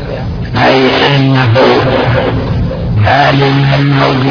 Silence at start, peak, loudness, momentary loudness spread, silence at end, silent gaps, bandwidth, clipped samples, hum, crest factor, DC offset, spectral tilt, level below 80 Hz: 0 s; 0 dBFS; -9 LUFS; 7 LU; 0 s; none; 5.4 kHz; 0.3%; none; 8 dB; under 0.1%; -7.5 dB/octave; -26 dBFS